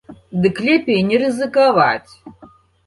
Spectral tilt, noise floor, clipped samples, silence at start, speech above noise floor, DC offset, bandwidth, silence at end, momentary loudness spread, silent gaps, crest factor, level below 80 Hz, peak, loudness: -6.5 dB/octave; -47 dBFS; under 0.1%; 0.1 s; 31 dB; under 0.1%; 11.5 kHz; 0.4 s; 6 LU; none; 16 dB; -54 dBFS; -2 dBFS; -16 LUFS